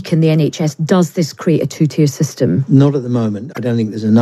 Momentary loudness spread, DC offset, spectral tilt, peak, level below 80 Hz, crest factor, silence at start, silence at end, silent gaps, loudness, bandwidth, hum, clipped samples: 6 LU; under 0.1%; -7 dB/octave; 0 dBFS; -58 dBFS; 14 dB; 0 s; 0 s; none; -15 LUFS; 13 kHz; none; under 0.1%